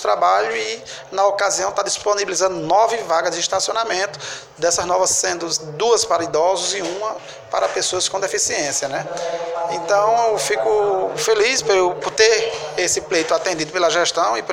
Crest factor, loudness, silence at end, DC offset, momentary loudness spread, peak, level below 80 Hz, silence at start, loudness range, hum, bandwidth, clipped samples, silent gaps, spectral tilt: 18 dB; -18 LUFS; 0 s; under 0.1%; 8 LU; 0 dBFS; -56 dBFS; 0 s; 3 LU; none; 16.5 kHz; under 0.1%; none; -1.5 dB/octave